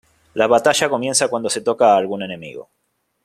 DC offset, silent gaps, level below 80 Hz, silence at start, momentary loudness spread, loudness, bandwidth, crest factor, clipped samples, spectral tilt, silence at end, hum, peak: under 0.1%; none; -62 dBFS; 0.35 s; 16 LU; -17 LUFS; 14 kHz; 18 dB; under 0.1%; -2.5 dB/octave; 0.65 s; none; -2 dBFS